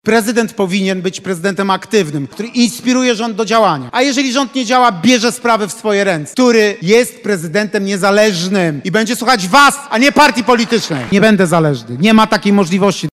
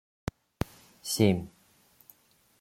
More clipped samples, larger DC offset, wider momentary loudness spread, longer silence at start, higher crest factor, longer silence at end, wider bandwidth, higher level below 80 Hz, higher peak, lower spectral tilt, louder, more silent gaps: first, 0.3% vs under 0.1%; neither; second, 7 LU vs 17 LU; second, 0.05 s vs 1.05 s; second, 12 dB vs 24 dB; second, 0.05 s vs 1.15 s; about the same, 16 kHz vs 16.5 kHz; about the same, -52 dBFS vs -56 dBFS; first, 0 dBFS vs -8 dBFS; about the same, -4.5 dB/octave vs -5.5 dB/octave; first, -12 LUFS vs -31 LUFS; neither